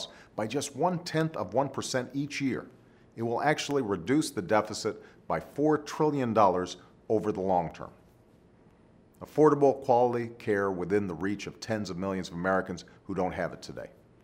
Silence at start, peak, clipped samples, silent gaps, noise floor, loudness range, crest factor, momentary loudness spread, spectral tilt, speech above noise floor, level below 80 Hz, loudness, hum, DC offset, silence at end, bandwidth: 0 s; -8 dBFS; under 0.1%; none; -59 dBFS; 4 LU; 22 dB; 14 LU; -5.5 dB/octave; 30 dB; -64 dBFS; -29 LUFS; none; under 0.1%; 0.35 s; 16 kHz